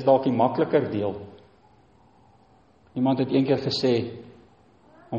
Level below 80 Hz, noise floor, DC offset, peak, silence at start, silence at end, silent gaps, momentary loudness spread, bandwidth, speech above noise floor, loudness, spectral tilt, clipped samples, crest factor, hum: -64 dBFS; -58 dBFS; under 0.1%; -6 dBFS; 0 s; 0 s; none; 17 LU; 8.2 kHz; 35 dB; -24 LUFS; -7.5 dB/octave; under 0.1%; 20 dB; none